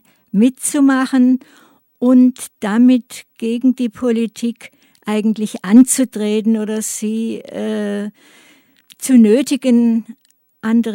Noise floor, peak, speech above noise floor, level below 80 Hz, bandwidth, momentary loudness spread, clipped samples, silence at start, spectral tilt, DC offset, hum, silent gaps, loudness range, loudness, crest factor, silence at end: -49 dBFS; 0 dBFS; 34 dB; -66 dBFS; 16.5 kHz; 13 LU; under 0.1%; 0.35 s; -5 dB/octave; under 0.1%; none; none; 3 LU; -15 LUFS; 16 dB; 0 s